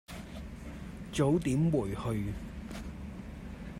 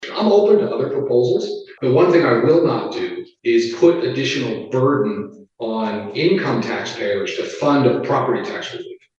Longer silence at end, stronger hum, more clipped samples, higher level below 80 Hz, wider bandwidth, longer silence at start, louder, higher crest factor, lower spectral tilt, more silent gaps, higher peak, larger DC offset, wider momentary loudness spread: second, 0 s vs 0.25 s; neither; neither; first, -48 dBFS vs -66 dBFS; first, 16 kHz vs 7.6 kHz; about the same, 0.1 s vs 0 s; second, -33 LUFS vs -18 LUFS; about the same, 18 dB vs 16 dB; about the same, -7 dB/octave vs -6.5 dB/octave; neither; second, -16 dBFS vs 0 dBFS; neither; first, 16 LU vs 12 LU